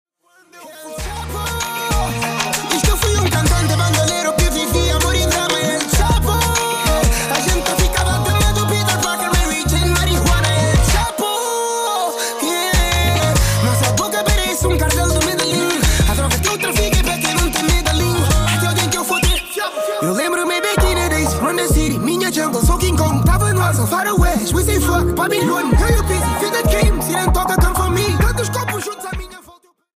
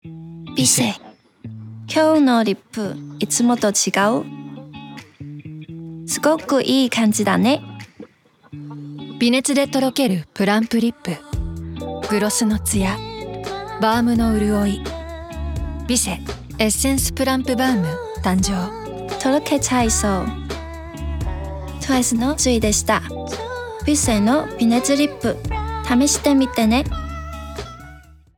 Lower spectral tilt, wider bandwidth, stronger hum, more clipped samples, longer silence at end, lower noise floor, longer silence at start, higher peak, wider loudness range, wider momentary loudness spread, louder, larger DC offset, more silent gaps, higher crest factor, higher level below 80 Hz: about the same, -4 dB/octave vs -4 dB/octave; second, 15.5 kHz vs 19.5 kHz; neither; neither; first, 0.6 s vs 0.25 s; about the same, -51 dBFS vs -48 dBFS; first, 0.55 s vs 0.05 s; about the same, -4 dBFS vs -4 dBFS; about the same, 1 LU vs 3 LU; second, 4 LU vs 18 LU; first, -16 LUFS vs -19 LUFS; neither; neither; about the same, 12 dB vs 16 dB; first, -22 dBFS vs -34 dBFS